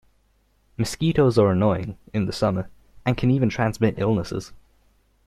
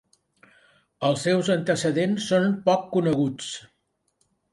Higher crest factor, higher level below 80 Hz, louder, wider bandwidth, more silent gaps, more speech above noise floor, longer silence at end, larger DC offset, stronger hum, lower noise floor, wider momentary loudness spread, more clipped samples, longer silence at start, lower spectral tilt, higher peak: about the same, 18 dB vs 18 dB; first, -46 dBFS vs -64 dBFS; about the same, -23 LUFS vs -24 LUFS; first, 14.5 kHz vs 11.5 kHz; neither; second, 42 dB vs 48 dB; second, 0.7 s vs 0.95 s; neither; neither; second, -63 dBFS vs -71 dBFS; first, 13 LU vs 7 LU; neither; second, 0.8 s vs 1 s; first, -7 dB/octave vs -5.5 dB/octave; first, -4 dBFS vs -8 dBFS